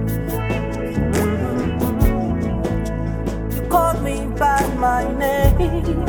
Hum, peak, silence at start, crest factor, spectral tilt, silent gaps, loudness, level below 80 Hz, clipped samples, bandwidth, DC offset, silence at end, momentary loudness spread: none; -2 dBFS; 0 s; 16 dB; -7 dB/octave; none; -20 LUFS; -24 dBFS; under 0.1%; over 20 kHz; under 0.1%; 0 s; 6 LU